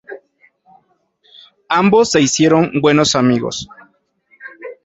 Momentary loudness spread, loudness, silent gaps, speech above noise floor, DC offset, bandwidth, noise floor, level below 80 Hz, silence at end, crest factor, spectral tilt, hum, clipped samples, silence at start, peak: 22 LU; -13 LUFS; none; 46 dB; under 0.1%; 8 kHz; -59 dBFS; -52 dBFS; 0.1 s; 16 dB; -4.5 dB/octave; none; under 0.1%; 0.1 s; 0 dBFS